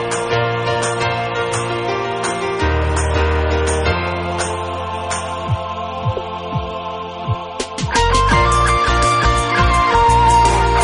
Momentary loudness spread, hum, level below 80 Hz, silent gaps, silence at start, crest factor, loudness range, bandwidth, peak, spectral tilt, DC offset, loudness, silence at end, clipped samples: 11 LU; none; -24 dBFS; none; 0 s; 16 dB; 8 LU; 11 kHz; 0 dBFS; -4.5 dB/octave; under 0.1%; -17 LUFS; 0 s; under 0.1%